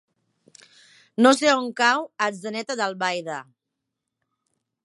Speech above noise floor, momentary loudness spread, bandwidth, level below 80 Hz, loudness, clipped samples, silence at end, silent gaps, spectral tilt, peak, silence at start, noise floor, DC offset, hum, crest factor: 61 dB; 15 LU; 11.5 kHz; -78 dBFS; -22 LUFS; under 0.1%; 1.45 s; none; -3 dB/octave; -4 dBFS; 1.2 s; -83 dBFS; under 0.1%; none; 22 dB